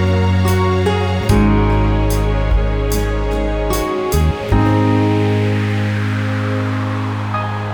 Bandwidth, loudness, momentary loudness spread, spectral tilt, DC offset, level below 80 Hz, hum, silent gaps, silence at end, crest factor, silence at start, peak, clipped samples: over 20 kHz; -16 LUFS; 5 LU; -7 dB/octave; under 0.1%; -22 dBFS; none; none; 0 s; 14 dB; 0 s; 0 dBFS; under 0.1%